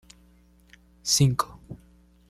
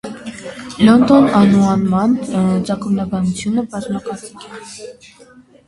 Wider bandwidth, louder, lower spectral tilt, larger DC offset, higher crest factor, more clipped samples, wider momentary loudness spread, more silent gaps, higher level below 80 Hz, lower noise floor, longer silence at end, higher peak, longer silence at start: first, 15 kHz vs 11.5 kHz; second, -24 LUFS vs -14 LUFS; second, -4 dB/octave vs -7 dB/octave; neither; first, 22 dB vs 16 dB; neither; first, 25 LU vs 22 LU; neither; about the same, -52 dBFS vs -48 dBFS; first, -57 dBFS vs -45 dBFS; second, 0.55 s vs 0.75 s; second, -8 dBFS vs 0 dBFS; first, 1.05 s vs 0.05 s